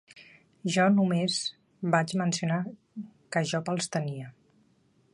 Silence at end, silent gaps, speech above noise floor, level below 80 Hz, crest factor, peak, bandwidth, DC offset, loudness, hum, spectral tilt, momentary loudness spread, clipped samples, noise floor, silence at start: 0.85 s; none; 39 dB; -72 dBFS; 20 dB; -10 dBFS; 11.5 kHz; under 0.1%; -28 LUFS; none; -5 dB/octave; 18 LU; under 0.1%; -66 dBFS; 0.15 s